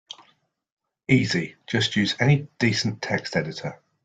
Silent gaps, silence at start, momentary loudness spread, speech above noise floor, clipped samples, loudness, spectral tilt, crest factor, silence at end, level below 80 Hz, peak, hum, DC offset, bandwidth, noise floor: none; 1.1 s; 15 LU; 42 dB; under 0.1%; -23 LUFS; -5 dB/octave; 22 dB; 0.3 s; -58 dBFS; -4 dBFS; none; under 0.1%; 9.2 kHz; -65 dBFS